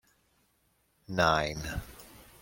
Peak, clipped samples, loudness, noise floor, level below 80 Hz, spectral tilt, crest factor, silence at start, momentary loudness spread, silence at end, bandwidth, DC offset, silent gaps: -10 dBFS; under 0.1%; -30 LUFS; -72 dBFS; -50 dBFS; -4.5 dB/octave; 24 dB; 1.1 s; 24 LU; 0.2 s; 16.5 kHz; under 0.1%; none